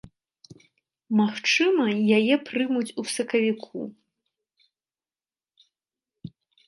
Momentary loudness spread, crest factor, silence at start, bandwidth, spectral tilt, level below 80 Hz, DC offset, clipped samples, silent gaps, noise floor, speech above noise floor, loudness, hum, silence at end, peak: 22 LU; 18 dB; 0.05 s; 11.5 kHz; -4.5 dB/octave; -70 dBFS; under 0.1%; under 0.1%; none; under -90 dBFS; over 67 dB; -23 LUFS; none; 0.4 s; -8 dBFS